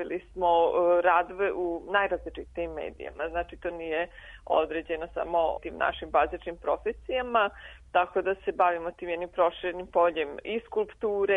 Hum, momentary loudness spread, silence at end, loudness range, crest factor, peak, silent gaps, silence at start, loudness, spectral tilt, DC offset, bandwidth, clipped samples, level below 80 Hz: none; 12 LU; 0 s; 4 LU; 18 dB; -10 dBFS; none; 0 s; -28 LUFS; -6.5 dB/octave; under 0.1%; 3.9 kHz; under 0.1%; -52 dBFS